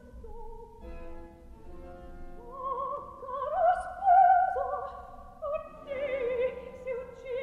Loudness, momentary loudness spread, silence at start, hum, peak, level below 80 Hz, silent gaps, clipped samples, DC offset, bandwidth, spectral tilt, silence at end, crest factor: -29 LUFS; 25 LU; 0.05 s; none; -12 dBFS; -50 dBFS; none; under 0.1%; under 0.1%; 9.8 kHz; -6 dB/octave; 0 s; 18 dB